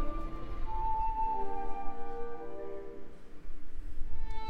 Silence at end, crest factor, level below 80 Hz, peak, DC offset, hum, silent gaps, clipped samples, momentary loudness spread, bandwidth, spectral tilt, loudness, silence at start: 0 s; 10 dB; -38 dBFS; -18 dBFS; under 0.1%; none; none; under 0.1%; 18 LU; 4.2 kHz; -7.5 dB/octave; -39 LUFS; 0 s